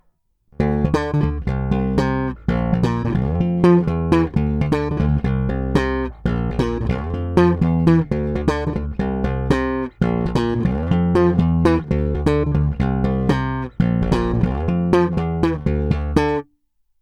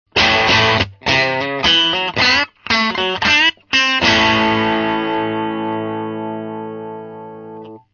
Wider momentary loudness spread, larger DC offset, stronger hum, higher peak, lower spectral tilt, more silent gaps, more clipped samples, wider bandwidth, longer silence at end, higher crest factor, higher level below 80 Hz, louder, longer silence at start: second, 6 LU vs 17 LU; neither; neither; about the same, 0 dBFS vs 0 dBFS; first, -8.5 dB/octave vs -3.5 dB/octave; neither; neither; first, 9.6 kHz vs 7.2 kHz; first, 0.6 s vs 0.15 s; about the same, 18 dB vs 16 dB; first, -28 dBFS vs -44 dBFS; second, -19 LUFS vs -14 LUFS; first, 0.6 s vs 0.15 s